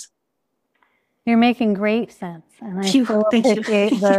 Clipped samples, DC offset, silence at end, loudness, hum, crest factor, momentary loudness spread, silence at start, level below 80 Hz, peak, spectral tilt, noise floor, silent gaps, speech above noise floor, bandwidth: under 0.1%; under 0.1%; 0 s; -18 LUFS; none; 16 dB; 15 LU; 0 s; -66 dBFS; -4 dBFS; -5.5 dB/octave; -75 dBFS; none; 58 dB; 12.5 kHz